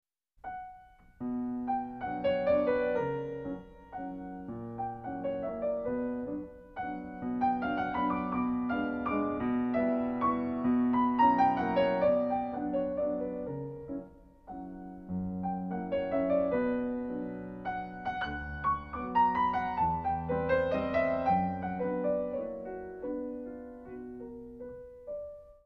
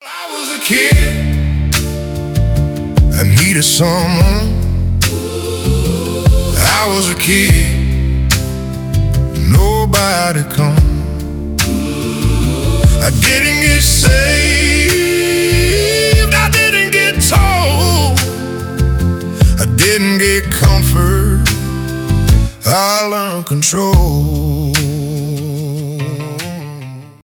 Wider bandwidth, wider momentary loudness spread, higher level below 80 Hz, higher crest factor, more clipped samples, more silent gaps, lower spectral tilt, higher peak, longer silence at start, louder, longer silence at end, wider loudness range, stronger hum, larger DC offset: second, 5.8 kHz vs over 20 kHz; first, 16 LU vs 10 LU; second, -56 dBFS vs -18 dBFS; first, 18 dB vs 12 dB; neither; neither; first, -9 dB/octave vs -4 dB/octave; second, -14 dBFS vs 0 dBFS; first, 0.45 s vs 0 s; second, -32 LUFS vs -12 LUFS; about the same, 0.15 s vs 0.2 s; first, 9 LU vs 4 LU; neither; neither